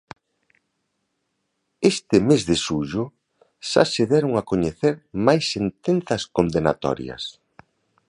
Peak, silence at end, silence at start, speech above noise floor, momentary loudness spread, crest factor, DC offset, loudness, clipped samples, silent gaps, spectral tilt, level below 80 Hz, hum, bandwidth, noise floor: 0 dBFS; 0.8 s; 1.8 s; 54 dB; 10 LU; 22 dB; under 0.1%; -21 LUFS; under 0.1%; none; -5.5 dB/octave; -50 dBFS; none; 11 kHz; -75 dBFS